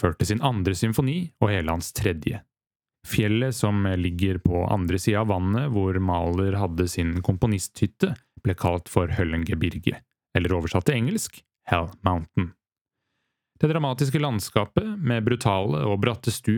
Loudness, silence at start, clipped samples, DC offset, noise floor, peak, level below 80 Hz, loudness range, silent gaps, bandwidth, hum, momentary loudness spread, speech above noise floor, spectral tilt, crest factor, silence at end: -25 LUFS; 0 s; under 0.1%; under 0.1%; under -90 dBFS; -2 dBFS; -46 dBFS; 3 LU; 12.81-12.85 s; 19 kHz; none; 5 LU; over 66 dB; -6 dB/octave; 22 dB; 0 s